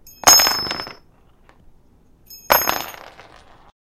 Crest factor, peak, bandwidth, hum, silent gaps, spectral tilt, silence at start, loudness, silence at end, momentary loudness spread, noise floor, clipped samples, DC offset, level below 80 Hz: 22 dB; 0 dBFS; 17 kHz; none; none; 0.5 dB/octave; 0.25 s; -15 LUFS; 1 s; 20 LU; -52 dBFS; under 0.1%; under 0.1%; -48 dBFS